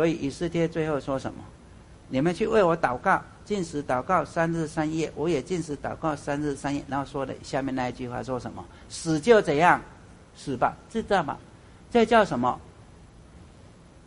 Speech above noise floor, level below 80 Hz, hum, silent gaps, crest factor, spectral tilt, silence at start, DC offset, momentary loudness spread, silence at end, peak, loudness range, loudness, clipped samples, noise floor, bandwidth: 25 dB; -50 dBFS; none; none; 22 dB; -6 dB/octave; 0 s; under 0.1%; 13 LU; 0.6 s; -4 dBFS; 5 LU; -26 LUFS; under 0.1%; -50 dBFS; 11 kHz